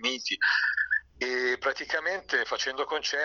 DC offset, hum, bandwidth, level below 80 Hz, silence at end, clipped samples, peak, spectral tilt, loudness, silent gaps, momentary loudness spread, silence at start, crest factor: under 0.1%; none; 7.2 kHz; -64 dBFS; 0 s; under 0.1%; -14 dBFS; -0.5 dB/octave; -28 LUFS; none; 5 LU; 0 s; 16 dB